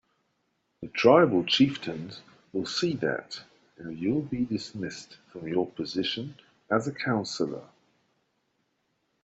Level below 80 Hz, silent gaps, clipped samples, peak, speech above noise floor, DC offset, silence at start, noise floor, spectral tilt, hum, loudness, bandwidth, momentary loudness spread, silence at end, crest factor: -68 dBFS; none; under 0.1%; -6 dBFS; 48 dB; under 0.1%; 0.8 s; -75 dBFS; -5.5 dB/octave; none; -27 LUFS; 8.2 kHz; 21 LU; 1.6 s; 22 dB